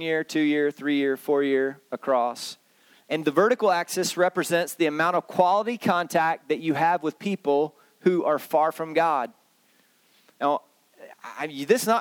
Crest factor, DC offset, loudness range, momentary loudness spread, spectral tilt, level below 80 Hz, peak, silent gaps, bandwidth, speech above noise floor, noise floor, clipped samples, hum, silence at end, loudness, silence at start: 20 dB; under 0.1%; 4 LU; 9 LU; -4.5 dB/octave; -80 dBFS; -6 dBFS; none; 19.5 kHz; 39 dB; -63 dBFS; under 0.1%; none; 0 s; -24 LUFS; 0 s